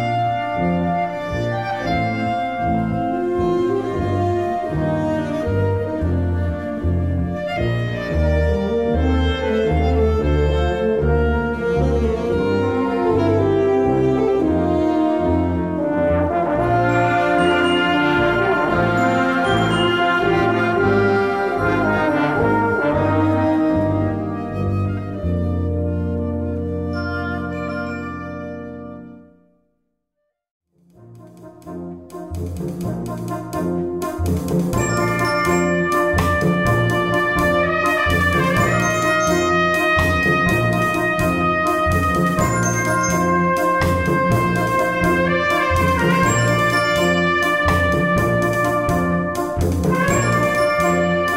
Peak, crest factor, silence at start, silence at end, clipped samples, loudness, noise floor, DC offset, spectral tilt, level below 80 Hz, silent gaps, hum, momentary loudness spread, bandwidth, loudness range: -4 dBFS; 14 dB; 0 s; 0 s; under 0.1%; -18 LUFS; -75 dBFS; 0.2%; -6 dB/octave; -32 dBFS; 30.51-30.60 s; none; 7 LU; 16 kHz; 9 LU